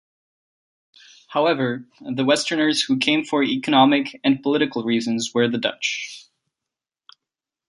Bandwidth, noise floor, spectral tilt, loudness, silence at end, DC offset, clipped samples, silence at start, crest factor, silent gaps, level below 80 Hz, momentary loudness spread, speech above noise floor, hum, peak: 11.5 kHz; -87 dBFS; -4 dB/octave; -20 LUFS; 1.45 s; under 0.1%; under 0.1%; 1.3 s; 20 dB; none; -68 dBFS; 10 LU; 67 dB; none; -2 dBFS